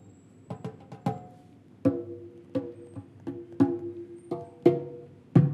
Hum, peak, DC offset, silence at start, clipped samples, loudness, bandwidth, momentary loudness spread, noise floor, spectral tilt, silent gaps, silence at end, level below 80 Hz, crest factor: none; -6 dBFS; under 0.1%; 0.05 s; under 0.1%; -30 LUFS; 9 kHz; 19 LU; -53 dBFS; -10 dB/octave; none; 0 s; -66 dBFS; 24 dB